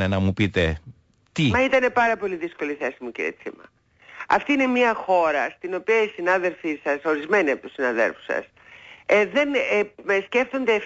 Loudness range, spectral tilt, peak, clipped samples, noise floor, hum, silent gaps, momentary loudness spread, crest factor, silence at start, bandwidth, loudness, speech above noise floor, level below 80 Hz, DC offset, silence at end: 2 LU; -6 dB/octave; -8 dBFS; under 0.1%; -48 dBFS; none; none; 10 LU; 16 dB; 0 s; 8 kHz; -22 LUFS; 26 dB; -48 dBFS; under 0.1%; 0 s